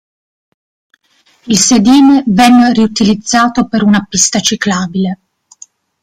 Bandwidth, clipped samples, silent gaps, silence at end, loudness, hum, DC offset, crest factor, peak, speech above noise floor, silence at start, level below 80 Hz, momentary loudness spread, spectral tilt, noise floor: 15.5 kHz; under 0.1%; none; 0.9 s; -9 LUFS; none; under 0.1%; 10 dB; 0 dBFS; 43 dB; 1.45 s; -44 dBFS; 8 LU; -3.5 dB/octave; -52 dBFS